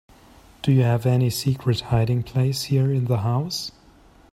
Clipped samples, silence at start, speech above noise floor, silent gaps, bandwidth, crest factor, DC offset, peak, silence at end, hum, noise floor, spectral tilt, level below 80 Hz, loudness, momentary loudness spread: under 0.1%; 0.65 s; 31 dB; none; 15 kHz; 16 dB; under 0.1%; -6 dBFS; 0.6 s; none; -52 dBFS; -6.5 dB/octave; -48 dBFS; -22 LUFS; 8 LU